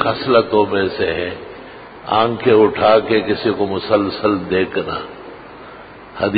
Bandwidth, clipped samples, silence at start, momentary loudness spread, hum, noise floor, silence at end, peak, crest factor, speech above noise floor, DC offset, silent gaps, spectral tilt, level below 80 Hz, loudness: 5 kHz; under 0.1%; 0 s; 23 LU; none; -37 dBFS; 0 s; 0 dBFS; 16 dB; 21 dB; under 0.1%; none; -11 dB/octave; -46 dBFS; -16 LUFS